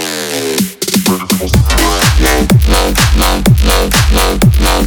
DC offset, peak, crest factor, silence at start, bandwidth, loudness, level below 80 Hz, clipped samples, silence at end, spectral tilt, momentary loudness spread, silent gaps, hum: under 0.1%; 0 dBFS; 10 dB; 0 s; over 20 kHz; -10 LUFS; -14 dBFS; under 0.1%; 0 s; -4.5 dB/octave; 5 LU; none; none